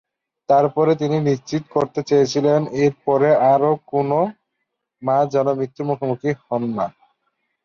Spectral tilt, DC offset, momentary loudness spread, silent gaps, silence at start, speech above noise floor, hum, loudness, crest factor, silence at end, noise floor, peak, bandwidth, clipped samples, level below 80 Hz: -7 dB/octave; under 0.1%; 8 LU; none; 0.5 s; 59 dB; none; -19 LUFS; 14 dB; 0.75 s; -77 dBFS; -4 dBFS; 7.2 kHz; under 0.1%; -62 dBFS